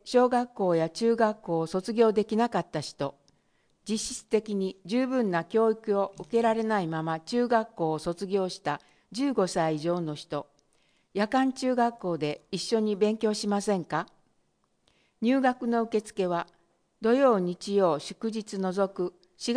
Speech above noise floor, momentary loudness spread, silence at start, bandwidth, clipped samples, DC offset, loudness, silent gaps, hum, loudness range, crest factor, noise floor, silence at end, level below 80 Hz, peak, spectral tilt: 44 dB; 9 LU; 0.05 s; 10.5 kHz; under 0.1%; under 0.1%; -28 LUFS; none; none; 3 LU; 18 dB; -71 dBFS; 0 s; -66 dBFS; -10 dBFS; -5.5 dB/octave